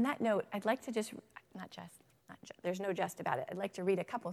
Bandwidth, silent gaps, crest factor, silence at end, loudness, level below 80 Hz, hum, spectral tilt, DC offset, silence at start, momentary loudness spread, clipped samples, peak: 15.5 kHz; none; 20 dB; 0 s; -37 LUFS; -82 dBFS; none; -5.5 dB/octave; under 0.1%; 0 s; 19 LU; under 0.1%; -18 dBFS